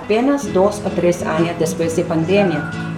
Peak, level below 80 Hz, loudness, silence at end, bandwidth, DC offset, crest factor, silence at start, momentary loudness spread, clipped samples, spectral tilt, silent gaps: -2 dBFS; -48 dBFS; -17 LUFS; 0 s; 15.5 kHz; under 0.1%; 16 dB; 0 s; 3 LU; under 0.1%; -6 dB/octave; none